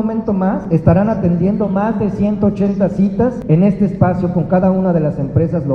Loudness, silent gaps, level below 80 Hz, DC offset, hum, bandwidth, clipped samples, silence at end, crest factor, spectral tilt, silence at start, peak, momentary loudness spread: -15 LUFS; none; -38 dBFS; under 0.1%; none; 6 kHz; under 0.1%; 0 s; 14 dB; -11 dB/octave; 0 s; 0 dBFS; 4 LU